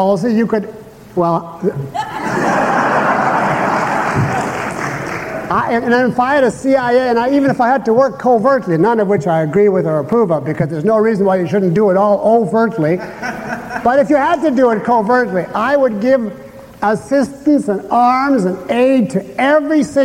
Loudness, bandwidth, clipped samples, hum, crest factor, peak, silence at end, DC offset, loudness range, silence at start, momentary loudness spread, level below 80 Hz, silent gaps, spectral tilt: -14 LUFS; 16 kHz; under 0.1%; none; 12 dB; -2 dBFS; 0 s; under 0.1%; 3 LU; 0 s; 8 LU; -48 dBFS; none; -7 dB/octave